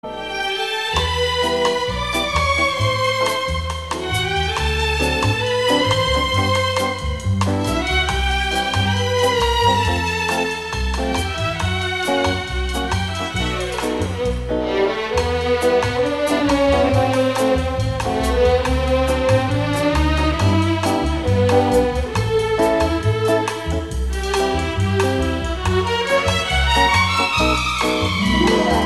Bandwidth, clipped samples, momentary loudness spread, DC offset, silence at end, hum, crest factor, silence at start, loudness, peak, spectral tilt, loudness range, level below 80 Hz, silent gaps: 13.5 kHz; under 0.1%; 6 LU; 0.3%; 0 s; none; 16 dB; 0.05 s; -18 LUFS; -2 dBFS; -5 dB/octave; 3 LU; -28 dBFS; none